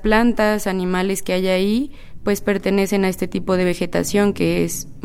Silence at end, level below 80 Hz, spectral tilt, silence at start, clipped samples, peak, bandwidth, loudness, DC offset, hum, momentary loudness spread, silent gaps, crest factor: 0 s; -36 dBFS; -5 dB/octave; 0 s; under 0.1%; -2 dBFS; 16.5 kHz; -19 LUFS; under 0.1%; none; 6 LU; none; 16 dB